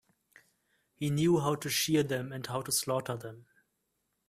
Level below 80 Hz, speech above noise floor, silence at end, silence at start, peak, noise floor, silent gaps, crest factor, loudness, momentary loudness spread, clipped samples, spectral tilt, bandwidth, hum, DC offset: -68 dBFS; 50 dB; 0.85 s; 1 s; -16 dBFS; -81 dBFS; none; 18 dB; -31 LUFS; 11 LU; under 0.1%; -4.5 dB/octave; 16 kHz; none; under 0.1%